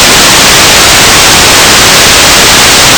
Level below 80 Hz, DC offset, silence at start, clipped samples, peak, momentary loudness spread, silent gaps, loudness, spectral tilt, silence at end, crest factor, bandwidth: -22 dBFS; under 0.1%; 0 s; 40%; 0 dBFS; 0 LU; none; 0 LUFS; -1 dB/octave; 0 s; 2 dB; over 20 kHz